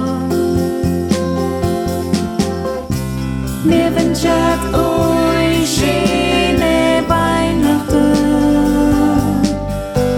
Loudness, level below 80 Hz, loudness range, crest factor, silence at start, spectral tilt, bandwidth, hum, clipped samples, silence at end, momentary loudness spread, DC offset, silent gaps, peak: -15 LUFS; -28 dBFS; 4 LU; 14 dB; 0 s; -5.5 dB/octave; 17.5 kHz; none; under 0.1%; 0 s; 6 LU; under 0.1%; none; 0 dBFS